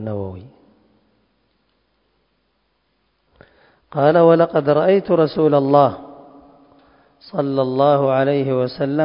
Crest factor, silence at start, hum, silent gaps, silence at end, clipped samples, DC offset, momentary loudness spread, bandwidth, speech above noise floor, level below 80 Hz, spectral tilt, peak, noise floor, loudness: 18 dB; 0 s; none; none; 0 s; under 0.1%; under 0.1%; 15 LU; 5.4 kHz; 51 dB; -56 dBFS; -12 dB/octave; 0 dBFS; -67 dBFS; -16 LUFS